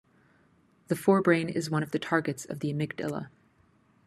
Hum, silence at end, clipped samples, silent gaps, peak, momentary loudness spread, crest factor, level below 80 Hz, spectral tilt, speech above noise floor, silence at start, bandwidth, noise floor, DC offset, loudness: none; 0.8 s; under 0.1%; none; -8 dBFS; 11 LU; 22 dB; -70 dBFS; -6 dB/octave; 37 dB; 0.9 s; 13 kHz; -65 dBFS; under 0.1%; -29 LUFS